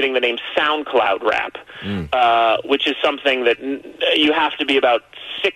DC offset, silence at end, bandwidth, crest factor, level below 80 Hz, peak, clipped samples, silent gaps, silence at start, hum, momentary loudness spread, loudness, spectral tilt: under 0.1%; 0.05 s; 12.5 kHz; 14 dB; -52 dBFS; -4 dBFS; under 0.1%; none; 0 s; none; 11 LU; -18 LUFS; -4.5 dB/octave